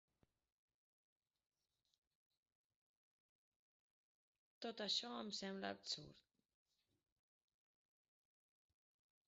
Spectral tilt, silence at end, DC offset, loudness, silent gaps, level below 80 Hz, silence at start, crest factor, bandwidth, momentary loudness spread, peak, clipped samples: -1.5 dB/octave; 3.1 s; under 0.1%; -47 LUFS; none; under -90 dBFS; 4.6 s; 28 dB; 7.4 kHz; 11 LU; -28 dBFS; under 0.1%